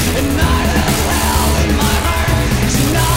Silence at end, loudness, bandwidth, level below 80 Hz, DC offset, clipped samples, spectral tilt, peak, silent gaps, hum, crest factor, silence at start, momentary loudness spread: 0 s; -14 LUFS; 16.5 kHz; -20 dBFS; 0.7%; under 0.1%; -4.5 dB/octave; 0 dBFS; none; none; 12 dB; 0 s; 1 LU